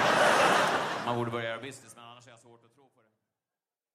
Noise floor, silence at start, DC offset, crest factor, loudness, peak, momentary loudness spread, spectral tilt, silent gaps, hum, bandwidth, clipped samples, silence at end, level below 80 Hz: under -90 dBFS; 0 s; under 0.1%; 20 dB; -27 LUFS; -12 dBFS; 22 LU; -3.5 dB/octave; none; none; 15.5 kHz; under 0.1%; 1.8 s; -70 dBFS